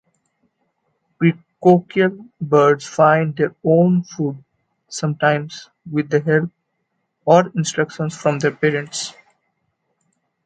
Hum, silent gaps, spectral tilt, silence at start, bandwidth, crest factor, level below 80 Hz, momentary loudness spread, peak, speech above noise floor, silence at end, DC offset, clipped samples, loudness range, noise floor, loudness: none; none; -6 dB/octave; 1.2 s; 9.4 kHz; 18 dB; -64 dBFS; 12 LU; 0 dBFS; 55 dB; 1.35 s; under 0.1%; under 0.1%; 4 LU; -72 dBFS; -18 LUFS